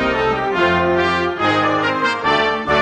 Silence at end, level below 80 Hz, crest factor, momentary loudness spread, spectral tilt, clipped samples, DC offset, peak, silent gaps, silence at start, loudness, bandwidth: 0 s; -42 dBFS; 14 dB; 2 LU; -5.5 dB/octave; under 0.1%; under 0.1%; -2 dBFS; none; 0 s; -16 LUFS; 10 kHz